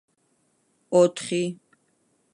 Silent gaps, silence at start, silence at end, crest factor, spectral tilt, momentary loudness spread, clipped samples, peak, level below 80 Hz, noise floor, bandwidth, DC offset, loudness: none; 0.9 s; 0.8 s; 20 dB; -5.5 dB/octave; 13 LU; under 0.1%; -8 dBFS; -78 dBFS; -69 dBFS; 11.5 kHz; under 0.1%; -23 LUFS